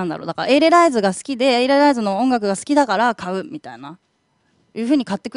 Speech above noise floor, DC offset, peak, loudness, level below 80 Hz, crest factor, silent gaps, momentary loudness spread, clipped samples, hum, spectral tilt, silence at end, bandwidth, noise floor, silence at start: 47 dB; under 0.1%; -2 dBFS; -17 LUFS; -64 dBFS; 16 dB; none; 18 LU; under 0.1%; none; -4.5 dB/octave; 0.05 s; 11 kHz; -64 dBFS; 0 s